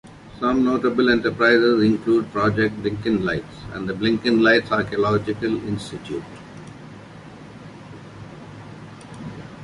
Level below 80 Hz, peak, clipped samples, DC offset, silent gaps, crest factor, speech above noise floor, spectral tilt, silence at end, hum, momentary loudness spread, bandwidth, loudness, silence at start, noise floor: -50 dBFS; -2 dBFS; under 0.1%; under 0.1%; none; 20 dB; 21 dB; -6.5 dB/octave; 0 s; none; 24 LU; 11 kHz; -20 LUFS; 0.05 s; -40 dBFS